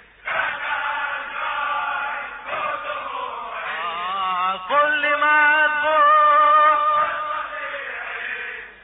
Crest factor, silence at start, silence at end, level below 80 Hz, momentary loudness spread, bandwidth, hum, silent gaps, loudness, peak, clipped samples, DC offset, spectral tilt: 12 dB; 0.25 s; 0.1 s; -60 dBFS; 14 LU; 4 kHz; none; none; -20 LUFS; -8 dBFS; under 0.1%; under 0.1%; -5 dB/octave